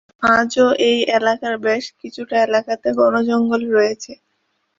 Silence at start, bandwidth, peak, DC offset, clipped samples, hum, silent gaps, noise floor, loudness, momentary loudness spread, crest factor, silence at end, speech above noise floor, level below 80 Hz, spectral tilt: 0.2 s; 7.8 kHz; -2 dBFS; under 0.1%; under 0.1%; none; none; -68 dBFS; -17 LUFS; 8 LU; 16 dB; 0.65 s; 52 dB; -58 dBFS; -4 dB/octave